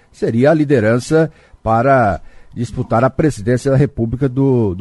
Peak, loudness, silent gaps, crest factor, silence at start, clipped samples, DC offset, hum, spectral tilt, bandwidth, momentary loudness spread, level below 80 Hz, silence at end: -2 dBFS; -15 LUFS; none; 14 dB; 0.2 s; under 0.1%; under 0.1%; none; -7.5 dB/octave; 11.5 kHz; 11 LU; -38 dBFS; 0 s